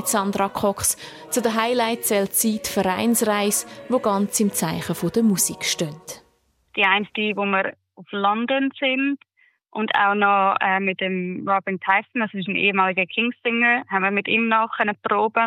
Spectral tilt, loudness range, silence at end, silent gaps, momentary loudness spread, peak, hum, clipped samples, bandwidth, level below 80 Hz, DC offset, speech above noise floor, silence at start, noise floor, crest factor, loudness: -3 dB/octave; 2 LU; 0 s; none; 7 LU; -4 dBFS; none; under 0.1%; 16.5 kHz; -62 dBFS; under 0.1%; 42 dB; 0 s; -64 dBFS; 18 dB; -21 LUFS